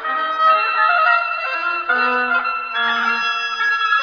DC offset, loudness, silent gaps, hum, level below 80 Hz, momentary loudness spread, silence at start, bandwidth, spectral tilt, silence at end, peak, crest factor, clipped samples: under 0.1%; -17 LUFS; none; none; -64 dBFS; 6 LU; 0 s; 5.4 kHz; -0.5 dB/octave; 0 s; -4 dBFS; 14 dB; under 0.1%